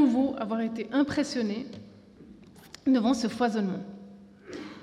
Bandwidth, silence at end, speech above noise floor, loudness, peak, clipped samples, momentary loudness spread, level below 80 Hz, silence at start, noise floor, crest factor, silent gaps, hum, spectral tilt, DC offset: 11.5 kHz; 0 s; 24 dB; -28 LUFS; -12 dBFS; under 0.1%; 20 LU; -66 dBFS; 0 s; -51 dBFS; 16 dB; none; none; -5.5 dB/octave; under 0.1%